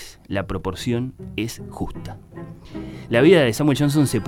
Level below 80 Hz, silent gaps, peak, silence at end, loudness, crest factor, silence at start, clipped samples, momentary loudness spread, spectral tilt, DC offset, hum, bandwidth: -42 dBFS; none; -2 dBFS; 0 s; -21 LUFS; 20 dB; 0 s; under 0.1%; 22 LU; -6 dB/octave; under 0.1%; none; 17.5 kHz